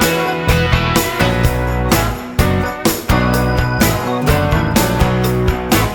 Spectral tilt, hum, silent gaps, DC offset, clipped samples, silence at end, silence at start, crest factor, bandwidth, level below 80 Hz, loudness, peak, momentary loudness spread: -5 dB/octave; none; none; under 0.1%; under 0.1%; 0 s; 0 s; 14 dB; 19.5 kHz; -22 dBFS; -15 LUFS; 0 dBFS; 3 LU